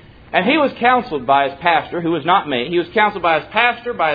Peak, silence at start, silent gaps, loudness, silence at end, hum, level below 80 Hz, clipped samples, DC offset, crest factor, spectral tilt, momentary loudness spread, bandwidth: 0 dBFS; 0.3 s; none; -16 LUFS; 0 s; none; -50 dBFS; under 0.1%; under 0.1%; 16 dB; -7.5 dB/octave; 5 LU; 5 kHz